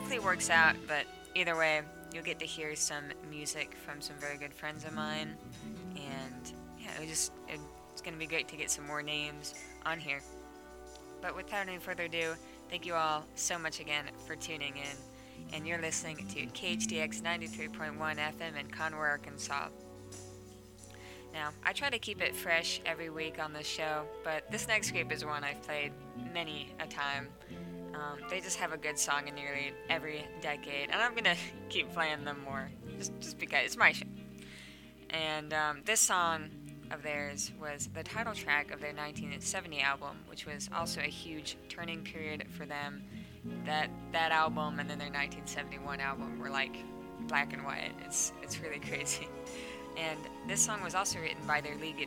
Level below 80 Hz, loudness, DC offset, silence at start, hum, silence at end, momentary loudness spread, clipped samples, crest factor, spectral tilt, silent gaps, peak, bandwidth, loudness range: -62 dBFS; -35 LUFS; under 0.1%; 0 s; none; 0 s; 15 LU; under 0.1%; 28 dB; -2 dB/octave; none; -10 dBFS; 19 kHz; 6 LU